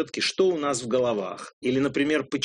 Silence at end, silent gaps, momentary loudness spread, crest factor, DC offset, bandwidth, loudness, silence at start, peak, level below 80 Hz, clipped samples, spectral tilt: 0 s; 1.53-1.61 s; 8 LU; 16 dB; under 0.1%; 10.5 kHz; -25 LUFS; 0 s; -10 dBFS; -64 dBFS; under 0.1%; -4 dB/octave